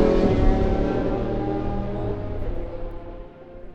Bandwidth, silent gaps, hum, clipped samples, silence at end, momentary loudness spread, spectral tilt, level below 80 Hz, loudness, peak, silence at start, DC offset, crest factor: 7 kHz; none; none; under 0.1%; 0 s; 20 LU; -9 dB/octave; -28 dBFS; -25 LUFS; -6 dBFS; 0 s; under 0.1%; 18 dB